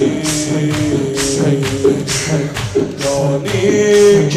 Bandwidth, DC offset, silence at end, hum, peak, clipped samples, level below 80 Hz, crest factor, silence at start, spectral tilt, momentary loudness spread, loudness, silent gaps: 15.5 kHz; under 0.1%; 0 s; none; -2 dBFS; under 0.1%; -40 dBFS; 12 dB; 0 s; -5 dB/octave; 8 LU; -14 LUFS; none